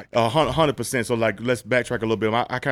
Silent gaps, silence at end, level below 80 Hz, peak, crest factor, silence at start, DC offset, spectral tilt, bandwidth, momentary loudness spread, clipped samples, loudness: none; 0 s; -48 dBFS; -6 dBFS; 16 dB; 0 s; under 0.1%; -5 dB/octave; 16 kHz; 4 LU; under 0.1%; -22 LUFS